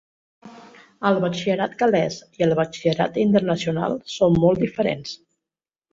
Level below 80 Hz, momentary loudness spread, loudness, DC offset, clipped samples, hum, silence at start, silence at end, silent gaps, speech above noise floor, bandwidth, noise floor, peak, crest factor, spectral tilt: -54 dBFS; 8 LU; -21 LUFS; under 0.1%; under 0.1%; none; 0.45 s; 0.75 s; none; 69 dB; 7.8 kHz; -89 dBFS; -4 dBFS; 18 dB; -6.5 dB/octave